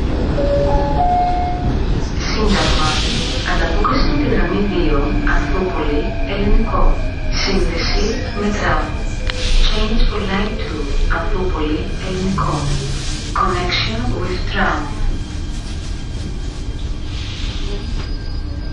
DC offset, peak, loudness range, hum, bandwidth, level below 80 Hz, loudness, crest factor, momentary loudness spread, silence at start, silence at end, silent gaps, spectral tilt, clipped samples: under 0.1%; -2 dBFS; 6 LU; none; 10.5 kHz; -20 dBFS; -19 LUFS; 14 dB; 10 LU; 0 s; 0 s; none; -5 dB/octave; under 0.1%